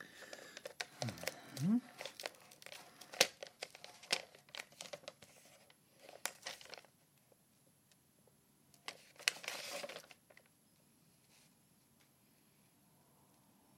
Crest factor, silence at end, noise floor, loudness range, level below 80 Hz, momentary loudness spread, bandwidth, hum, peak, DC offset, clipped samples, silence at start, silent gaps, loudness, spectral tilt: 42 dB; 3.45 s; -72 dBFS; 12 LU; under -90 dBFS; 22 LU; 16 kHz; none; -4 dBFS; under 0.1%; under 0.1%; 0 s; none; -43 LUFS; -3 dB/octave